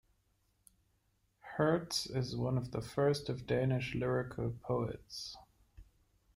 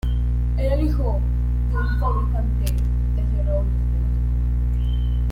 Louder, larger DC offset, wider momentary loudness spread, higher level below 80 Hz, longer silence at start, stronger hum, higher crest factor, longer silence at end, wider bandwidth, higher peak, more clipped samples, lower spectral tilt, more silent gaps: second, -36 LUFS vs -23 LUFS; neither; first, 12 LU vs 2 LU; second, -60 dBFS vs -20 dBFS; first, 1.45 s vs 0.05 s; second, none vs 60 Hz at -20 dBFS; first, 18 dB vs 10 dB; first, 0.55 s vs 0 s; first, 15.5 kHz vs 5.2 kHz; second, -20 dBFS vs -8 dBFS; neither; second, -6 dB/octave vs -8.5 dB/octave; neither